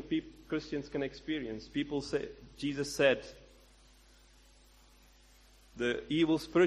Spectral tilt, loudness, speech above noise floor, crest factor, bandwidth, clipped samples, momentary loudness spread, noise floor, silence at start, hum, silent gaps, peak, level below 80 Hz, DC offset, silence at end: -5 dB/octave; -34 LUFS; 28 dB; 20 dB; 13.5 kHz; under 0.1%; 10 LU; -61 dBFS; 0 s; none; none; -14 dBFS; -60 dBFS; under 0.1%; 0 s